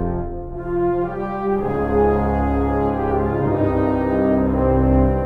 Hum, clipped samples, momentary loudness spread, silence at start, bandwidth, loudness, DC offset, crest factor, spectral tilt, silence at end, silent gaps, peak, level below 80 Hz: none; under 0.1%; 7 LU; 0 s; 4.4 kHz; -20 LUFS; under 0.1%; 14 dB; -11 dB/octave; 0 s; none; -4 dBFS; -28 dBFS